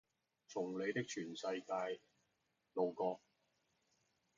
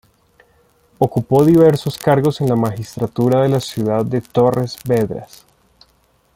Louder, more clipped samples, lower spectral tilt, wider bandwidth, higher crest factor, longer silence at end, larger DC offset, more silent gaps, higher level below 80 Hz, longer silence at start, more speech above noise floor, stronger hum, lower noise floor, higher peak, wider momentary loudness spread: second, -43 LUFS vs -16 LUFS; neither; second, -4 dB/octave vs -7.5 dB/octave; second, 7.4 kHz vs 16.5 kHz; about the same, 20 dB vs 16 dB; about the same, 1.2 s vs 1.1 s; neither; neither; second, -88 dBFS vs -50 dBFS; second, 0.5 s vs 1 s; about the same, 43 dB vs 42 dB; neither; first, -84 dBFS vs -58 dBFS; second, -26 dBFS vs -2 dBFS; about the same, 9 LU vs 10 LU